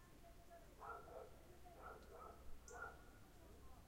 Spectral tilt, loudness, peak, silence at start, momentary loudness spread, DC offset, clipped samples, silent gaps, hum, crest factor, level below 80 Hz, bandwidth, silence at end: -4.5 dB/octave; -60 LUFS; -42 dBFS; 0 s; 10 LU; under 0.1%; under 0.1%; none; none; 18 dB; -66 dBFS; 16 kHz; 0 s